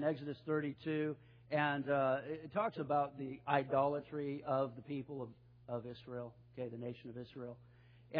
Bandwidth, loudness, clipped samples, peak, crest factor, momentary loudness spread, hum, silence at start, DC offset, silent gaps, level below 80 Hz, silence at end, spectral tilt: 5.2 kHz; -39 LUFS; under 0.1%; -18 dBFS; 22 dB; 14 LU; none; 0 s; under 0.1%; none; -74 dBFS; 0 s; -5.5 dB/octave